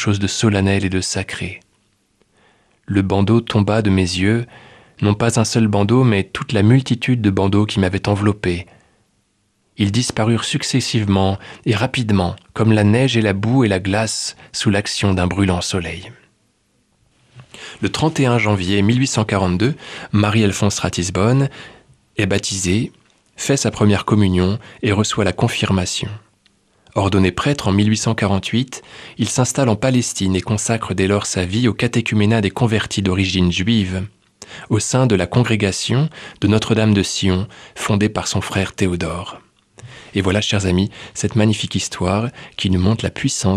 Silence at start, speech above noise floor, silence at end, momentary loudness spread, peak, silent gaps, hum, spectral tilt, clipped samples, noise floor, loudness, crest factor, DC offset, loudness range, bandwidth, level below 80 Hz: 0 s; 47 dB; 0 s; 8 LU; -2 dBFS; none; none; -5 dB/octave; under 0.1%; -64 dBFS; -17 LUFS; 16 dB; under 0.1%; 4 LU; 13.5 kHz; -44 dBFS